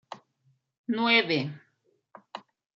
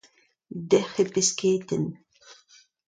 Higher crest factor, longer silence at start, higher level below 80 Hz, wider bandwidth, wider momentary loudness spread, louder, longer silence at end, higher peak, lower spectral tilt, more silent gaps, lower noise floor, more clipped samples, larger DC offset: about the same, 22 dB vs 20 dB; second, 0.1 s vs 0.5 s; second, -80 dBFS vs -66 dBFS; second, 7.4 kHz vs 9.6 kHz; first, 24 LU vs 13 LU; about the same, -25 LUFS vs -25 LUFS; second, 0.35 s vs 0.55 s; about the same, -10 dBFS vs -8 dBFS; first, -6 dB/octave vs -4 dB/octave; first, 0.78-0.84 s vs none; first, -72 dBFS vs -62 dBFS; neither; neither